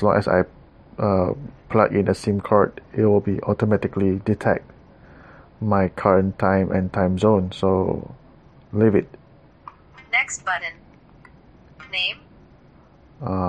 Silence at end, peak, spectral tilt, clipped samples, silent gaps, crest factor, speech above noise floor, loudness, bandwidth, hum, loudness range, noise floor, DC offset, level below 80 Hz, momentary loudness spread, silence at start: 0 s; 0 dBFS; -6.5 dB/octave; under 0.1%; none; 22 dB; 31 dB; -21 LUFS; 10 kHz; none; 6 LU; -51 dBFS; under 0.1%; -50 dBFS; 11 LU; 0 s